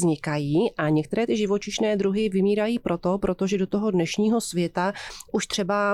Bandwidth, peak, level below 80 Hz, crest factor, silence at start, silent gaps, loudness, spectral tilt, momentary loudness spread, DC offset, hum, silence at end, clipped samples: 14 kHz; -12 dBFS; -52 dBFS; 10 dB; 0 s; none; -24 LUFS; -5.5 dB/octave; 4 LU; under 0.1%; none; 0 s; under 0.1%